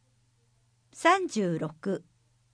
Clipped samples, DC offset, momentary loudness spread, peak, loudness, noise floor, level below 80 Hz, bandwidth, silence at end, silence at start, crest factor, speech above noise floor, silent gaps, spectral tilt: under 0.1%; under 0.1%; 11 LU; -10 dBFS; -28 LUFS; -68 dBFS; -74 dBFS; 10.5 kHz; 0.55 s; 0.95 s; 20 dB; 41 dB; none; -5 dB/octave